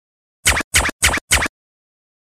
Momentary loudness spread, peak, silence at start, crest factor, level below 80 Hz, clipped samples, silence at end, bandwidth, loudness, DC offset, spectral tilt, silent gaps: 4 LU; 0 dBFS; 0.45 s; 20 dB; -32 dBFS; under 0.1%; 0.85 s; 14.5 kHz; -16 LUFS; under 0.1%; -1.5 dB/octave; 0.64-0.71 s, 0.92-0.99 s, 1.21-1.28 s